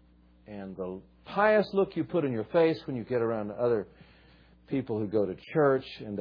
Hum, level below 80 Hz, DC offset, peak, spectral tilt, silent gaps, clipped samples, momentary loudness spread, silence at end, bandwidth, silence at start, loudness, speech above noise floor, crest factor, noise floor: none; -62 dBFS; under 0.1%; -10 dBFS; -9 dB/octave; none; under 0.1%; 14 LU; 0 s; 5.2 kHz; 0.5 s; -29 LUFS; 29 dB; 20 dB; -58 dBFS